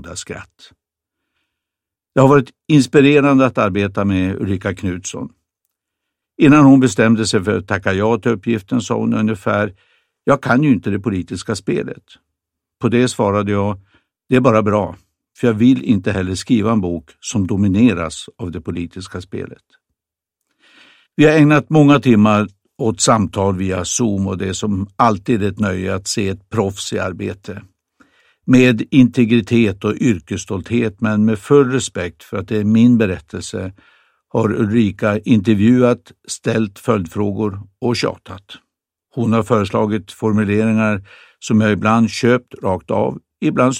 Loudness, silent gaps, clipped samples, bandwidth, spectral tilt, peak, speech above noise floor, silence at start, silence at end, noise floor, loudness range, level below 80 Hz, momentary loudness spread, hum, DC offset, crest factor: -16 LUFS; none; under 0.1%; 12 kHz; -6 dB/octave; 0 dBFS; 69 dB; 0.05 s; 0 s; -84 dBFS; 6 LU; -50 dBFS; 15 LU; none; under 0.1%; 16 dB